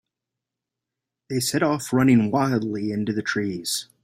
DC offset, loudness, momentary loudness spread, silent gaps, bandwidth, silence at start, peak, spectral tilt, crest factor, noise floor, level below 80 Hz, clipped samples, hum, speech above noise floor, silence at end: under 0.1%; -23 LUFS; 9 LU; none; 16 kHz; 1.3 s; -6 dBFS; -5 dB/octave; 18 dB; -86 dBFS; -62 dBFS; under 0.1%; none; 64 dB; 0.2 s